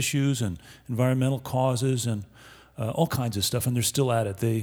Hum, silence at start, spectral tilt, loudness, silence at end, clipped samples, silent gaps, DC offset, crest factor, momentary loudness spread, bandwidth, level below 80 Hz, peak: none; 0 s; -5 dB/octave; -26 LUFS; 0 s; under 0.1%; none; under 0.1%; 18 dB; 10 LU; over 20 kHz; -56 dBFS; -8 dBFS